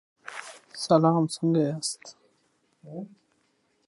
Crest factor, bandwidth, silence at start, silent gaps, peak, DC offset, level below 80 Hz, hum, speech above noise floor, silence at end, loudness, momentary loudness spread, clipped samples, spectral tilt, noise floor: 22 dB; 11.5 kHz; 0.25 s; none; -6 dBFS; under 0.1%; -76 dBFS; none; 45 dB; 0.8 s; -25 LUFS; 21 LU; under 0.1%; -6 dB/octave; -70 dBFS